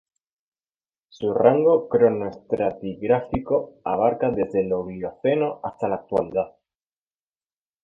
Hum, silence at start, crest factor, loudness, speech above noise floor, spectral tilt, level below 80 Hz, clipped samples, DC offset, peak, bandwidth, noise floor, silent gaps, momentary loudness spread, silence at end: none; 1.2 s; 20 dB; -23 LUFS; over 68 dB; -9 dB/octave; -54 dBFS; under 0.1%; under 0.1%; -4 dBFS; 4.5 kHz; under -90 dBFS; none; 10 LU; 1.35 s